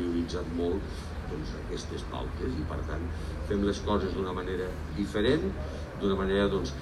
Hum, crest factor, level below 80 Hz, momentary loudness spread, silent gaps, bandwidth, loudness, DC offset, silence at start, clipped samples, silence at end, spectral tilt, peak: none; 18 dB; -38 dBFS; 10 LU; none; 12.5 kHz; -32 LUFS; under 0.1%; 0 s; under 0.1%; 0 s; -6.5 dB/octave; -14 dBFS